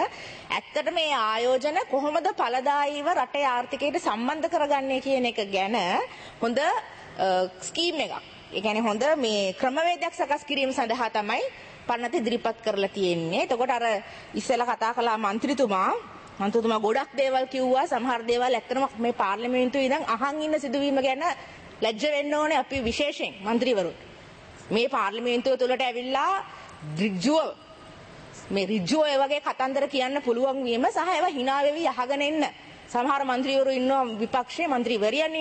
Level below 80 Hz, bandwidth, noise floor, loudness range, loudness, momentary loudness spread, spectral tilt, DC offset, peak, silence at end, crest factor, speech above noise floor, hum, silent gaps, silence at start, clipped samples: -60 dBFS; 8.8 kHz; -47 dBFS; 2 LU; -26 LUFS; 7 LU; -4 dB/octave; under 0.1%; -10 dBFS; 0 s; 16 dB; 21 dB; none; none; 0 s; under 0.1%